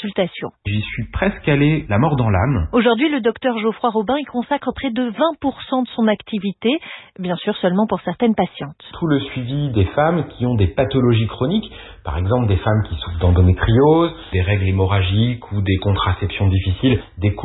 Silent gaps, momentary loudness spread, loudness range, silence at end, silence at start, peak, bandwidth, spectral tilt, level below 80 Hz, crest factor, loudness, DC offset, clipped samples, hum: none; 8 LU; 4 LU; 0 s; 0 s; -4 dBFS; 4.1 kHz; -12.5 dB/octave; -34 dBFS; 14 dB; -18 LUFS; under 0.1%; under 0.1%; none